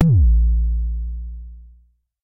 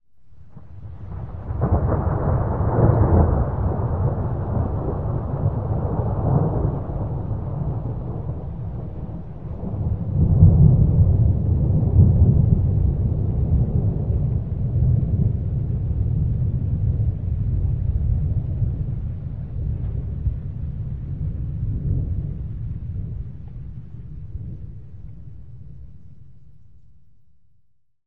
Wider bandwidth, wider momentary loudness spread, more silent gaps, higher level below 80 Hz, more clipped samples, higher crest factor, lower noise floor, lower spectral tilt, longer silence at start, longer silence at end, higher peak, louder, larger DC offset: second, 0.9 kHz vs 2.2 kHz; first, 22 LU vs 19 LU; neither; first, -20 dBFS vs -28 dBFS; neither; second, 16 dB vs 22 dB; second, -55 dBFS vs -62 dBFS; second, -11.5 dB/octave vs -14 dB/octave; about the same, 0 s vs 0 s; first, 0.6 s vs 0 s; about the same, -2 dBFS vs 0 dBFS; about the same, -20 LUFS vs -22 LUFS; second, under 0.1% vs 1%